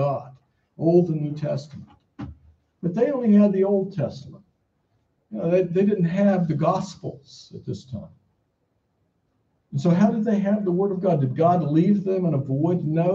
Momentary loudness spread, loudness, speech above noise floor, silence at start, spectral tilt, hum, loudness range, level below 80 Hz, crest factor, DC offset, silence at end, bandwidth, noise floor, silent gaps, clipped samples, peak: 19 LU; -22 LUFS; 50 dB; 0 s; -9 dB/octave; none; 6 LU; -60 dBFS; 16 dB; under 0.1%; 0 s; 7.4 kHz; -71 dBFS; none; under 0.1%; -6 dBFS